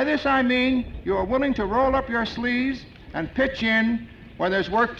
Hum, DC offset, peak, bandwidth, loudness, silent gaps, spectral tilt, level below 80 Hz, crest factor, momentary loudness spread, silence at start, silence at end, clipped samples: none; under 0.1%; -10 dBFS; 7.2 kHz; -23 LUFS; none; -6.5 dB/octave; -42 dBFS; 12 dB; 10 LU; 0 s; 0 s; under 0.1%